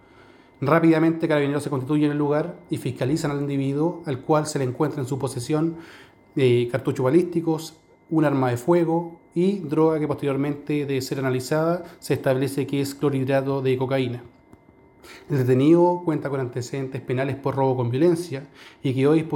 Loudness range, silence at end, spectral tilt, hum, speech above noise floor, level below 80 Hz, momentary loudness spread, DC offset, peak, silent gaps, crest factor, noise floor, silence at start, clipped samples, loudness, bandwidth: 3 LU; 0 s; -7 dB/octave; none; 31 dB; -62 dBFS; 10 LU; under 0.1%; -4 dBFS; none; 20 dB; -53 dBFS; 0.6 s; under 0.1%; -23 LUFS; 17 kHz